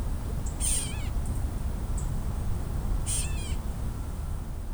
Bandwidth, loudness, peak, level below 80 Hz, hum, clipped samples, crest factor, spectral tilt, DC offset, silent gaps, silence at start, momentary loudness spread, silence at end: over 20 kHz; -32 LUFS; -12 dBFS; -32 dBFS; none; under 0.1%; 16 dB; -4 dB/octave; under 0.1%; none; 0 s; 8 LU; 0 s